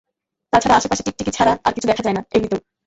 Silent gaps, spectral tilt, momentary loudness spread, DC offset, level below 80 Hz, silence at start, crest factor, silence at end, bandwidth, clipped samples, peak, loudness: none; -4 dB/octave; 7 LU; under 0.1%; -44 dBFS; 0.55 s; 18 dB; 0.3 s; 8.2 kHz; under 0.1%; -2 dBFS; -18 LUFS